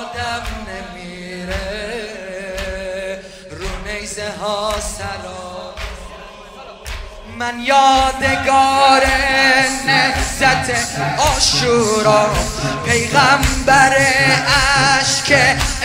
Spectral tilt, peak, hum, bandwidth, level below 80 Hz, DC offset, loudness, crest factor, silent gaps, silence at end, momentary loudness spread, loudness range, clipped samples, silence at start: -3 dB/octave; 0 dBFS; none; 16 kHz; -30 dBFS; under 0.1%; -14 LUFS; 16 dB; none; 0 s; 19 LU; 13 LU; under 0.1%; 0 s